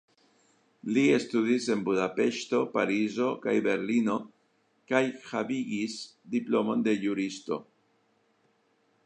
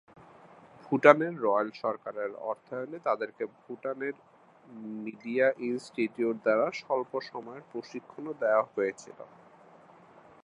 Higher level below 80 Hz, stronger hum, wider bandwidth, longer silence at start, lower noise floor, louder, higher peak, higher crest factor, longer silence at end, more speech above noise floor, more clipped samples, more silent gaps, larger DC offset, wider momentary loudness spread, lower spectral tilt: about the same, -78 dBFS vs -82 dBFS; neither; about the same, 9.8 kHz vs 10.5 kHz; about the same, 0.85 s vs 0.85 s; first, -70 dBFS vs -56 dBFS; about the same, -29 LUFS vs -30 LUFS; second, -10 dBFS vs -2 dBFS; second, 20 dB vs 28 dB; first, 1.45 s vs 1.2 s; first, 42 dB vs 26 dB; neither; neither; neither; second, 8 LU vs 16 LU; about the same, -5 dB/octave vs -6 dB/octave